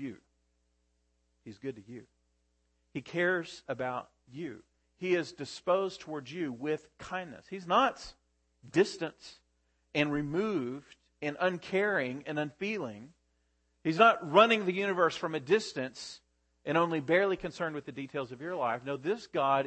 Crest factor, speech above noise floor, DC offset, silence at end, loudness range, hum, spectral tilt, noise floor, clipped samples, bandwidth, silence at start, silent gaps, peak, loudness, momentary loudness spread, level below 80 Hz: 26 dB; 44 dB; under 0.1%; 0 s; 9 LU; none; -5 dB/octave; -75 dBFS; under 0.1%; 8.8 kHz; 0 s; none; -8 dBFS; -31 LUFS; 16 LU; -68 dBFS